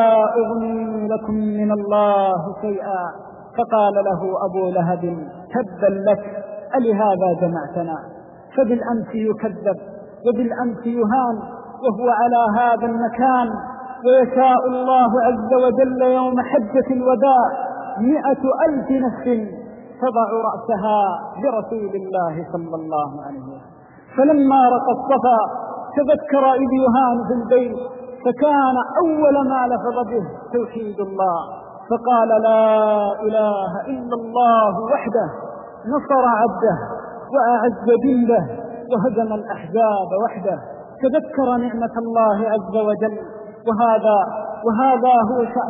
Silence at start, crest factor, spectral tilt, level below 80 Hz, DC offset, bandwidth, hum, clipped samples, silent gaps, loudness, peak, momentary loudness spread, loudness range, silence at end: 0 s; 14 dB; -3 dB/octave; -56 dBFS; under 0.1%; 3.9 kHz; none; under 0.1%; none; -18 LUFS; -4 dBFS; 12 LU; 5 LU; 0 s